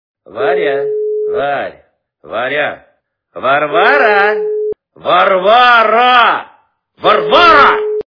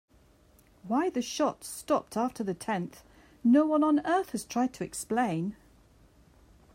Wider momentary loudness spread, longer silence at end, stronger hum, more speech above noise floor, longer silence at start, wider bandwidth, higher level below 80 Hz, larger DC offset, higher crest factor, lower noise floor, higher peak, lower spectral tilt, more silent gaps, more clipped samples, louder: first, 13 LU vs 10 LU; second, 0.05 s vs 1.2 s; neither; first, 47 dB vs 33 dB; second, 0.3 s vs 0.85 s; second, 5.4 kHz vs 16 kHz; first, -48 dBFS vs -64 dBFS; neither; second, 12 dB vs 18 dB; second, -57 dBFS vs -61 dBFS; first, 0 dBFS vs -14 dBFS; about the same, -4.5 dB/octave vs -5 dB/octave; neither; first, 0.5% vs under 0.1%; first, -10 LUFS vs -29 LUFS